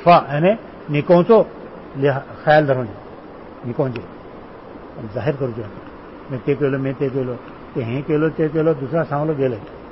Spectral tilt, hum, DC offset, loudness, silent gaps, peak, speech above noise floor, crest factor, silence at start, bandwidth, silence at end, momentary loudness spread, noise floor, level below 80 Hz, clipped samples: -12 dB/octave; none; 0.1%; -19 LUFS; none; -2 dBFS; 19 dB; 16 dB; 0 s; 5.8 kHz; 0 s; 22 LU; -37 dBFS; -50 dBFS; under 0.1%